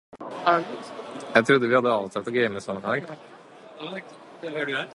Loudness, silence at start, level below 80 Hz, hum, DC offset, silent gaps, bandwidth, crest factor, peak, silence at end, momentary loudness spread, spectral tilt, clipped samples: -24 LUFS; 0.15 s; -70 dBFS; none; under 0.1%; none; 11.5 kHz; 24 dB; -2 dBFS; 0 s; 19 LU; -5.5 dB/octave; under 0.1%